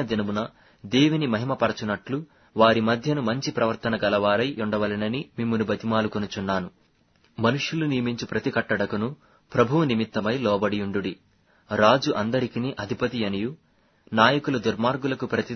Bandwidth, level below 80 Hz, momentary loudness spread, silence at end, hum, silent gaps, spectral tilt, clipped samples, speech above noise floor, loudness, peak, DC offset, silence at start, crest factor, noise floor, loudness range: 6.6 kHz; -58 dBFS; 10 LU; 0 s; none; none; -6 dB/octave; under 0.1%; 39 dB; -24 LUFS; -2 dBFS; under 0.1%; 0 s; 22 dB; -63 dBFS; 3 LU